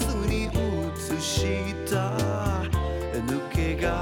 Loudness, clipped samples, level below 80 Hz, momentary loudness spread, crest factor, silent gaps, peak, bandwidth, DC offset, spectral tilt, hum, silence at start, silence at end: -27 LUFS; under 0.1%; -34 dBFS; 4 LU; 12 dB; none; -14 dBFS; 18 kHz; under 0.1%; -5.5 dB/octave; none; 0 s; 0 s